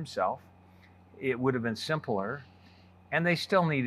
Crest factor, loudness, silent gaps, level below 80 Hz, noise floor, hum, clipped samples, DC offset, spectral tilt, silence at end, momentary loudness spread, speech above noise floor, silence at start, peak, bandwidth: 20 dB; -30 LUFS; none; -72 dBFS; -57 dBFS; none; under 0.1%; under 0.1%; -6 dB/octave; 0 s; 11 LU; 27 dB; 0 s; -10 dBFS; 14 kHz